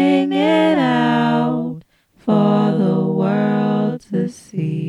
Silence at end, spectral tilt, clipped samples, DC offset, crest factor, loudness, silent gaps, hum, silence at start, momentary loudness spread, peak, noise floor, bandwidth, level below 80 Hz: 0 s; -7.5 dB/octave; under 0.1%; under 0.1%; 14 dB; -17 LUFS; none; none; 0 s; 10 LU; -2 dBFS; -44 dBFS; 11 kHz; -64 dBFS